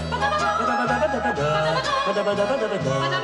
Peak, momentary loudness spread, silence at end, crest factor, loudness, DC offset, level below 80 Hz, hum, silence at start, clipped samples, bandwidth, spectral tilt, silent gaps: -10 dBFS; 2 LU; 0 s; 14 dB; -22 LUFS; under 0.1%; -44 dBFS; none; 0 s; under 0.1%; 11.5 kHz; -5 dB/octave; none